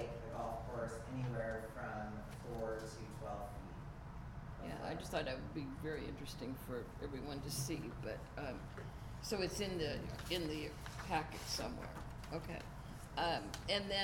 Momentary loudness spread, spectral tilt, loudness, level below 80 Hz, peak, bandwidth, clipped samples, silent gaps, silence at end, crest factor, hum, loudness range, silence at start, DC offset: 10 LU; -4.5 dB/octave; -44 LUFS; -54 dBFS; -22 dBFS; 17.5 kHz; under 0.1%; none; 0 s; 22 dB; none; 4 LU; 0 s; under 0.1%